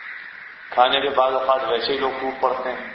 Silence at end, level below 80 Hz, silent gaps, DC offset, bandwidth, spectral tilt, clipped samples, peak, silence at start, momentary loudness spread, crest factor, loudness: 0 s; -58 dBFS; none; under 0.1%; 6 kHz; -5.5 dB/octave; under 0.1%; 0 dBFS; 0 s; 17 LU; 22 dB; -21 LUFS